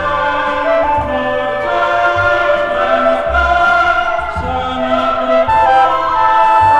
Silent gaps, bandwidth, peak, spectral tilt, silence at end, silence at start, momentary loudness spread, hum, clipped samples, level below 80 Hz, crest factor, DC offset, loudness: none; 9.8 kHz; 0 dBFS; -5.5 dB/octave; 0 s; 0 s; 6 LU; none; under 0.1%; -32 dBFS; 12 dB; under 0.1%; -13 LUFS